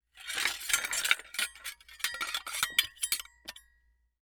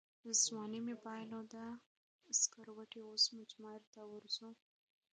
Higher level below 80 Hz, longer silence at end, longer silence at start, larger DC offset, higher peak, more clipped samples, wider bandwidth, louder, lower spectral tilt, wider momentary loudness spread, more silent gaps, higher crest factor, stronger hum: first, -66 dBFS vs under -90 dBFS; about the same, 0.65 s vs 0.6 s; about the same, 0.15 s vs 0.25 s; neither; first, -6 dBFS vs -22 dBFS; neither; first, over 20 kHz vs 10 kHz; first, -31 LUFS vs -39 LUFS; second, 2.5 dB/octave vs -0.5 dB/octave; second, 15 LU vs 20 LU; second, none vs 1.86-2.19 s, 3.87-3.93 s; first, 30 dB vs 22 dB; neither